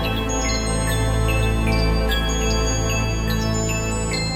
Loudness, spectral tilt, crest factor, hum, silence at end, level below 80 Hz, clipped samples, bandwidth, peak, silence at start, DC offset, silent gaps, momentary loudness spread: -21 LUFS; -4.5 dB/octave; 12 dB; none; 0 s; -24 dBFS; under 0.1%; 16 kHz; -8 dBFS; 0 s; under 0.1%; none; 2 LU